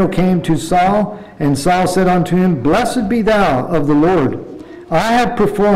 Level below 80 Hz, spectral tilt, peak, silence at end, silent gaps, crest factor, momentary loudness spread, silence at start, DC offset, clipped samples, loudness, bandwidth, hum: -34 dBFS; -6.5 dB/octave; -6 dBFS; 0 s; none; 6 dB; 7 LU; 0 s; 0.7%; under 0.1%; -14 LUFS; 15.5 kHz; none